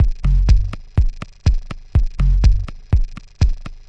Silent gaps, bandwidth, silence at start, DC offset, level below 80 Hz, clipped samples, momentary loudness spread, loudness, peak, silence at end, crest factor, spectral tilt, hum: none; 6.6 kHz; 0 s; 0.7%; -16 dBFS; under 0.1%; 7 LU; -20 LUFS; -2 dBFS; 0.15 s; 14 dB; -7 dB/octave; none